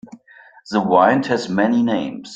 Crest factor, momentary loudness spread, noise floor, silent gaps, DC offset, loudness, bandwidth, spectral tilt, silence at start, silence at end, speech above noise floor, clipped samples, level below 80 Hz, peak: 18 dB; 8 LU; -47 dBFS; none; under 0.1%; -17 LUFS; 7.8 kHz; -6 dB/octave; 0.05 s; 0 s; 30 dB; under 0.1%; -60 dBFS; 0 dBFS